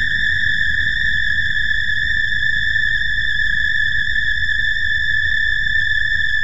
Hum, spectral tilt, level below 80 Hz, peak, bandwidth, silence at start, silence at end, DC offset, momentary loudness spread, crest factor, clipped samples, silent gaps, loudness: none; -1.5 dB/octave; -32 dBFS; -6 dBFS; 9.4 kHz; 0 s; 0 s; 8%; 1 LU; 12 dB; under 0.1%; none; -16 LUFS